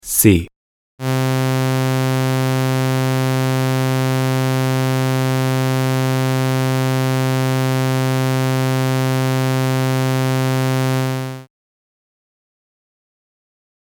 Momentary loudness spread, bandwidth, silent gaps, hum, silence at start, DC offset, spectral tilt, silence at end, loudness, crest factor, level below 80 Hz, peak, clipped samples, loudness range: 1 LU; 18.5 kHz; 0.56-0.98 s; none; 0.05 s; under 0.1%; -5.5 dB/octave; 2.55 s; -18 LUFS; 18 dB; -48 dBFS; 0 dBFS; under 0.1%; 4 LU